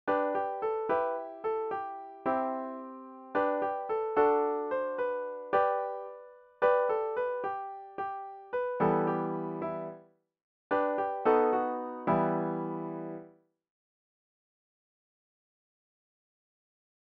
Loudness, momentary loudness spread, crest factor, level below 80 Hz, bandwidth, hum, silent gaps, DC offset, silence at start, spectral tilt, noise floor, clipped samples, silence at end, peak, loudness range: -32 LUFS; 14 LU; 20 dB; -72 dBFS; 5.2 kHz; none; 10.43-10.70 s; under 0.1%; 0.05 s; -6 dB/octave; -56 dBFS; under 0.1%; 3.85 s; -12 dBFS; 5 LU